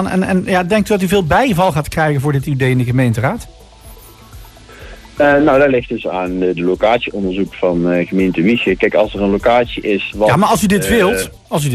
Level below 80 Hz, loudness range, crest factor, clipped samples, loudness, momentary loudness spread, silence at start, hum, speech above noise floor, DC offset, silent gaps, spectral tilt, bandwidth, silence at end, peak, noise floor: -36 dBFS; 3 LU; 12 dB; under 0.1%; -14 LUFS; 7 LU; 0 s; none; 24 dB; under 0.1%; none; -6 dB/octave; 14.5 kHz; 0 s; -2 dBFS; -38 dBFS